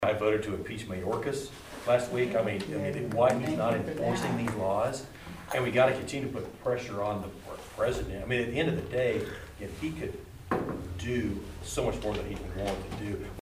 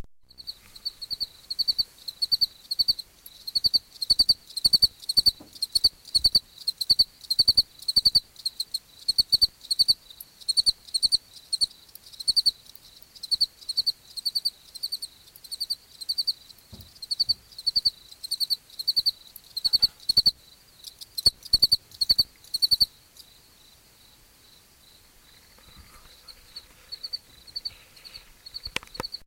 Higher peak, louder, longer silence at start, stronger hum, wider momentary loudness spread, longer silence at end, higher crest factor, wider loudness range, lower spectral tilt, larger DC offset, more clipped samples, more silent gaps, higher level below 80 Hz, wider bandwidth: second, -12 dBFS vs -6 dBFS; second, -31 LUFS vs -23 LUFS; about the same, 0 s vs 0 s; neither; second, 12 LU vs 18 LU; about the same, 0 s vs 0.1 s; about the same, 20 dB vs 22 dB; second, 5 LU vs 9 LU; first, -5.5 dB/octave vs 0 dB/octave; neither; neither; neither; about the same, -48 dBFS vs -52 dBFS; about the same, 15.5 kHz vs 17 kHz